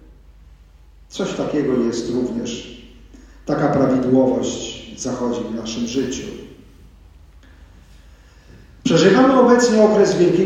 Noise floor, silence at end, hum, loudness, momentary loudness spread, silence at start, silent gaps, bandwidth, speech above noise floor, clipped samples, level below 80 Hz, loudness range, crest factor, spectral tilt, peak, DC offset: -46 dBFS; 0 s; none; -18 LUFS; 17 LU; 1.1 s; none; 10.5 kHz; 30 dB; under 0.1%; -46 dBFS; 11 LU; 18 dB; -5.5 dB/octave; 0 dBFS; under 0.1%